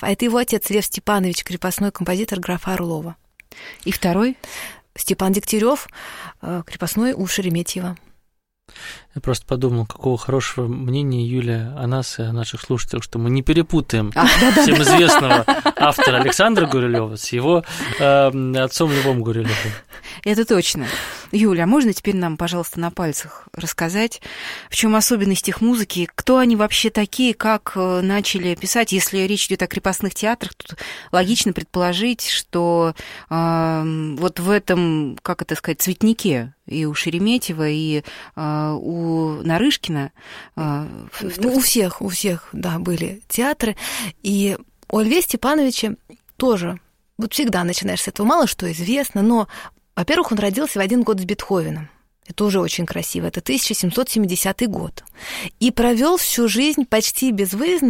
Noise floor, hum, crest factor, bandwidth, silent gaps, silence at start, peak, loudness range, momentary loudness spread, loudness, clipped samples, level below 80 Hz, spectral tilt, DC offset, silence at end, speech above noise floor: -63 dBFS; none; 20 dB; 16.5 kHz; none; 0 s; 0 dBFS; 7 LU; 13 LU; -19 LUFS; under 0.1%; -42 dBFS; -4.5 dB/octave; under 0.1%; 0 s; 44 dB